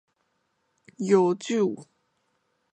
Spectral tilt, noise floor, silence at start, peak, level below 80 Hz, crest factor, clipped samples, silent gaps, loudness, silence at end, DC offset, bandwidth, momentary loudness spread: -6 dB/octave; -74 dBFS; 1 s; -8 dBFS; -76 dBFS; 20 dB; under 0.1%; none; -24 LUFS; 0.9 s; under 0.1%; 9.2 kHz; 13 LU